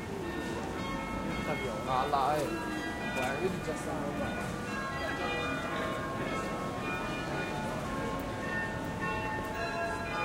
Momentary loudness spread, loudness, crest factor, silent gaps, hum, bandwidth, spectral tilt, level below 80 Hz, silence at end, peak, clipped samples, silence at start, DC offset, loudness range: 4 LU; -34 LUFS; 18 dB; none; none; 16 kHz; -5 dB/octave; -50 dBFS; 0 s; -16 dBFS; under 0.1%; 0 s; under 0.1%; 2 LU